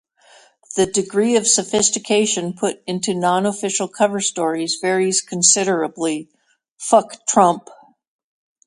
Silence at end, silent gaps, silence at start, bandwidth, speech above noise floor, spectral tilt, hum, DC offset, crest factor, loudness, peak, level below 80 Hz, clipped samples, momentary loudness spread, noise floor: 0.9 s; 6.71-6.76 s; 0.7 s; 11.5 kHz; 33 dB; -3 dB/octave; none; under 0.1%; 20 dB; -18 LUFS; 0 dBFS; -62 dBFS; under 0.1%; 9 LU; -51 dBFS